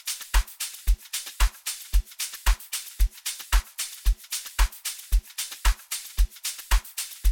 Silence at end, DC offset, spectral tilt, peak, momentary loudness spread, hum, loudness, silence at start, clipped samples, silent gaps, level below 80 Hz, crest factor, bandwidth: 0 s; under 0.1%; -1 dB/octave; -8 dBFS; 6 LU; none; -29 LUFS; 0.05 s; under 0.1%; none; -26 dBFS; 18 dB; 17.5 kHz